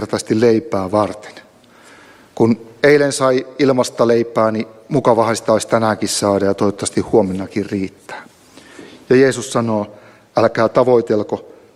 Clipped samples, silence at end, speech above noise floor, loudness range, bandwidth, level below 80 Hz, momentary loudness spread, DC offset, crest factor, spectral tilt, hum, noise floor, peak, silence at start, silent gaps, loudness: under 0.1%; 0.35 s; 30 dB; 3 LU; 13.5 kHz; -54 dBFS; 10 LU; under 0.1%; 16 dB; -5 dB/octave; none; -45 dBFS; 0 dBFS; 0 s; none; -16 LUFS